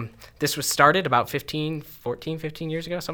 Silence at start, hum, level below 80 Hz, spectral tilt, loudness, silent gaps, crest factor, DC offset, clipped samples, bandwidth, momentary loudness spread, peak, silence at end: 0 s; none; -54 dBFS; -4 dB/octave; -24 LUFS; none; 22 dB; under 0.1%; under 0.1%; over 20 kHz; 14 LU; -2 dBFS; 0 s